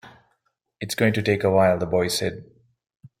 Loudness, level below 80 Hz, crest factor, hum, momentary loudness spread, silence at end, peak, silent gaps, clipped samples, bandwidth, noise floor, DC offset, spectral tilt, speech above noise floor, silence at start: -22 LUFS; -56 dBFS; 18 dB; none; 13 LU; 0.15 s; -6 dBFS; none; under 0.1%; 16.5 kHz; -72 dBFS; under 0.1%; -5 dB/octave; 51 dB; 0.05 s